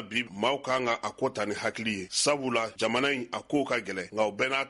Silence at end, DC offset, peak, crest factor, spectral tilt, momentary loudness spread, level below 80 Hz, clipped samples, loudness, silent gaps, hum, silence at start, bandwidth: 0 s; under 0.1%; -12 dBFS; 16 dB; -3 dB/octave; 5 LU; -68 dBFS; under 0.1%; -29 LUFS; none; none; 0 s; 11.5 kHz